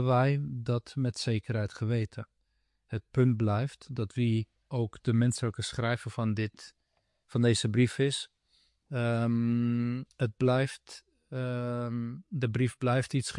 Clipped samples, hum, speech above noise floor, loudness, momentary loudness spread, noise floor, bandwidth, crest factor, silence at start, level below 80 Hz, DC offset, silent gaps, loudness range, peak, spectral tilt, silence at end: under 0.1%; none; 47 dB; -31 LUFS; 11 LU; -77 dBFS; 11.5 kHz; 16 dB; 0 s; -64 dBFS; under 0.1%; none; 2 LU; -14 dBFS; -6.5 dB/octave; 0 s